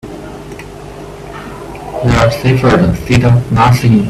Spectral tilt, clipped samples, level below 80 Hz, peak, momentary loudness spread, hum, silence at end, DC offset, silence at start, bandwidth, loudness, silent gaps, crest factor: -7 dB/octave; under 0.1%; -30 dBFS; 0 dBFS; 19 LU; 50 Hz at -35 dBFS; 0 s; under 0.1%; 0.05 s; 14 kHz; -10 LUFS; none; 12 dB